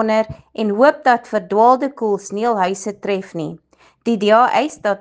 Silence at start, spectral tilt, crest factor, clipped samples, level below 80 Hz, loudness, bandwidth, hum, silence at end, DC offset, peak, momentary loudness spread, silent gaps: 0 s; -5 dB/octave; 16 dB; under 0.1%; -58 dBFS; -17 LUFS; 9.8 kHz; none; 0.05 s; under 0.1%; 0 dBFS; 12 LU; none